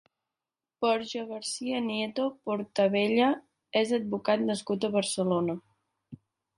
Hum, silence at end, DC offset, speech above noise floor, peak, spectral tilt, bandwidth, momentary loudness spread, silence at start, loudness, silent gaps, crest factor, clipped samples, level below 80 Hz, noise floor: none; 0.45 s; under 0.1%; over 62 dB; -12 dBFS; -4.5 dB/octave; 11.5 kHz; 9 LU; 0.8 s; -29 LUFS; none; 18 dB; under 0.1%; -74 dBFS; under -90 dBFS